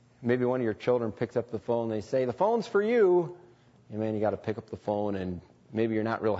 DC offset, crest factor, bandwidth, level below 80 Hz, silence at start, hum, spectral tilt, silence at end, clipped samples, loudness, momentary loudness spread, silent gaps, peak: under 0.1%; 16 dB; 8 kHz; -66 dBFS; 0.2 s; none; -8 dB/octave; 0 s; under 0.1%; -29 LUFS; 12 LU; none; -14 dBFS